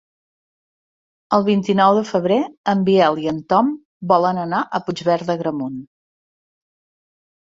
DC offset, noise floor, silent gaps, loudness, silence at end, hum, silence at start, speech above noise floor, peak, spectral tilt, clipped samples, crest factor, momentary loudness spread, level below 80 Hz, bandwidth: under 0.1%; under -90 dBFS; 2.57-2.64 s, 3.85-4.00 s; -18 LUFS; 1.65 s; none; 1.3 s; over 72 dB; -2 dBFS; -7 dB/octave; under 0.1%; 18 dB; 9 LU; -62 dBFS; 7.6 kHz